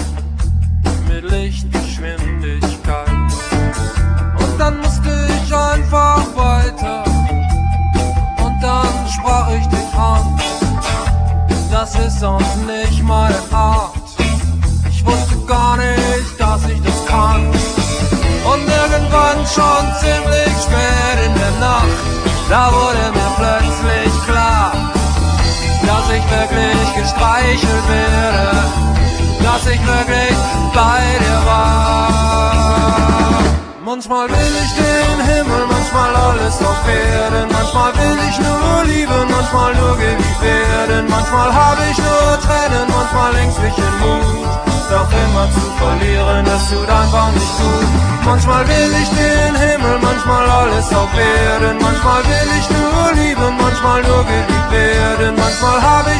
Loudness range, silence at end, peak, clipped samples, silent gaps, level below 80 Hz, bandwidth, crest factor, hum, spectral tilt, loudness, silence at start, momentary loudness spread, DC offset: 3 LU; 0 s; 0 dBFS; under 0.1%; none; -18 dBFS; 10.5 kHz; 12 dB; none; -5 dB/octave; -14 LUFS; 0 s; 5 LU; under 0.1%